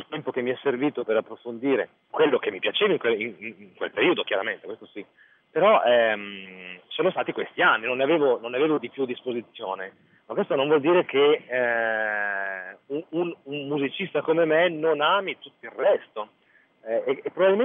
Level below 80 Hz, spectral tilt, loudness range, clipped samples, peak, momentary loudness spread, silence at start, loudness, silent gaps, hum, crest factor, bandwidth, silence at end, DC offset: -86 dBFS; -8 dB/octave; 2 LU; under 0.1%; -8 dBFS; 17 LU; 0 s; -24 LUFS; none; none; 18 dB; 3.9 kHz; 0 s; under 0.1%